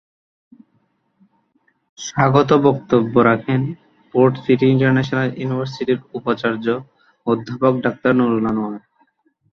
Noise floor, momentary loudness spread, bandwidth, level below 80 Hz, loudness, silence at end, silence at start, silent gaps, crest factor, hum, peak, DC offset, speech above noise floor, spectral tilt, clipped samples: -64 dBFS; 12 LU; 7.2 kHz; -56 dBFS; -18 LUFS; 0.75 s; 2 s; none; 18 dB; none; -2 dBFS; under 0.1%; 48 dB; -7 dB/octave; under 0.1%